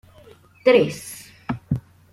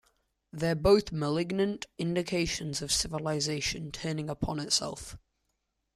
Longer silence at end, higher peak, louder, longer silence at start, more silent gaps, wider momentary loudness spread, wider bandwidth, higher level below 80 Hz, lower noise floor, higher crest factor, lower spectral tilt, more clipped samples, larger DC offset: second, 0.35 s vs 0.75 s; first, -4 dBFS vs -12 dBFS; first, -21 LUFS vs -30 LUFS; about the same, 0.65 s vs 0.55 s; neither; first, 18 LU vs 10 LU; about the same, 15 kHz vs 14 kHz; about the same, -52 dBFS vs -50 dBFS; second, -49 dBFS vs -80 dBFS; about the same, 20 dB vs 20 dB; first, -5.5 dB/octave vs -4 dB/octave; neither; neither